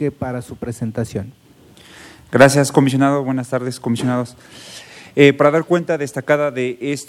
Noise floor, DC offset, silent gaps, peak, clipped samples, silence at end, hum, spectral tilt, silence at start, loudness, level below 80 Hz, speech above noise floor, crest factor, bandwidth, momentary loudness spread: -45 dBFS; under 0.1%; none; 0 dBFS; 0.2%; 0.05 s; none; -5.5 dB/octave; 0 s; -17 LUFS; -54 dBFS; 28 dB; 18 dB; 15.5 kHz; 18 LU